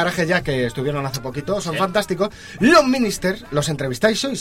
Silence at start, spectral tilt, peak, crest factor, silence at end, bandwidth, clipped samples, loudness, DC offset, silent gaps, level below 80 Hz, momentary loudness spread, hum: 0 s; -4.5 dB/octave; -2 dBFS; 16 dB; 0 s; 16.5 kHz; under 0.1%; -19 LUFS; 0.2%; none; -44 dBFS; 11 LU; none